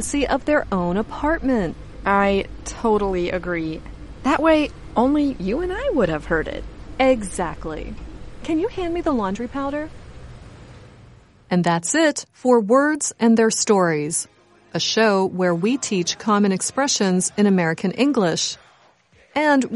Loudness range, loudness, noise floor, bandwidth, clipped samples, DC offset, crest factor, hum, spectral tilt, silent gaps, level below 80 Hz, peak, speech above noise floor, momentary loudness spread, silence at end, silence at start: 7 LU; -20 LUFS; -55 dBFS; 11.5 kHz; under 0.1%; under 0.1%; 18 dB; none; -4.5 dB/octave; none; -40 dBFS; -2 dBFS; 35 dB; 13 LU; 0 s; 0 s